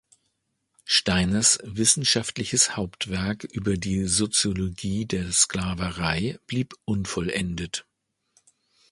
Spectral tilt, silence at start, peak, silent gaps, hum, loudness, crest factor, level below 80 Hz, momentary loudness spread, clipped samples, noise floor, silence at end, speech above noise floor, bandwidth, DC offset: -3 dB/octave; 0.85 s; -4 dBFS; none; none; -24 LUFS; 22 dB; -46 dBFS; 10 LU; under 0.1%; -76 dBFS; 1.1 s; 51 dB; 11.5 kHz; under 0.1%